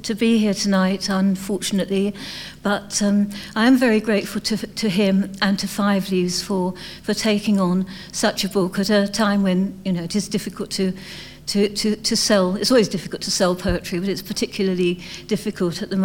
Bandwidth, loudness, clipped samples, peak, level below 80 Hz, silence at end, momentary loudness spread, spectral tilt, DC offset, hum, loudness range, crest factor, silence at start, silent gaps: 17 kHz; -21 LUFS; under 0.1%; -4 dBFS; -46 dBFS; 0 s; 8 LU; -4.5 dB/octave; 0.2%; none; 2 LU; 16 dB; 0 s; none